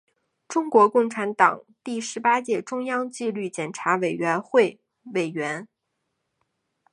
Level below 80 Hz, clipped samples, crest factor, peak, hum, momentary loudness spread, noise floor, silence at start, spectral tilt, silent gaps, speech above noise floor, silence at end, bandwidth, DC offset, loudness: -78 dBFS; under 0.1%; 22 dB; -2 dBFS; none; 11 LU; -78 dBFS; 0.5 s; -4.5 dB/octave; none; 55 dB; 1.25 s; 11 kHz; under 0.1%; -23 LUFS